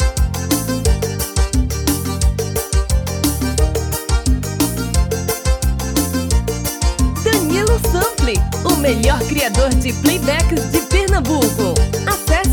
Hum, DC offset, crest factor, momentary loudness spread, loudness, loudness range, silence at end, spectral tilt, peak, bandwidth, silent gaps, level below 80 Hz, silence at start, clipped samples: none; under 0.1%; 16 dB; 4 LU; -17 LUFS; 3 LU; 0 s; -4.5 dB/octave; 0 dBFS; over 20 kHz; none; -20 dBFS; 0 s; under 0.1%